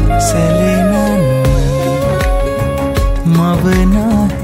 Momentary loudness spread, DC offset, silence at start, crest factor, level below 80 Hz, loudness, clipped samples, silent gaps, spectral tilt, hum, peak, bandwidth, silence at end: 4 LU; under 0.1%; 0 s; 10 dB; -18 dBFS; -13 LUFS; under 0.1%; none; -6.5 dB/octave; none; -2 dBFS; 16.5 kHz; 0 s